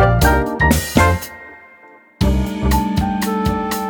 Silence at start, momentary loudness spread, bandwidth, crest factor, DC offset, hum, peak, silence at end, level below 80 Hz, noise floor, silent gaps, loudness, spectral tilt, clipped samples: 0 s; 9 LU; 20 kHz; 16 dB; under 0.1%; none; 0 dBFS; 0 s; -24 dBFS; -45 dBFS; none; -17 LUFS; -5.5 dB/octave; under 0.1%